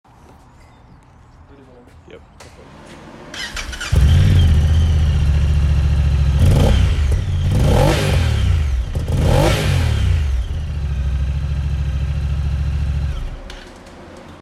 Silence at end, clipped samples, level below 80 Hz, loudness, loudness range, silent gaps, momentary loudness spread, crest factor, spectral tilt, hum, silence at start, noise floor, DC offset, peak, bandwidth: 0.05 s; under 0.1%; -20 dBFS; -17 LUFS; 7 LU; none; 18 LU; 12 dB; -6.5 dB/octave; none; 2.15 s; -45 dBFS; under 0.1%; -4 dBFS; 13.5 kHz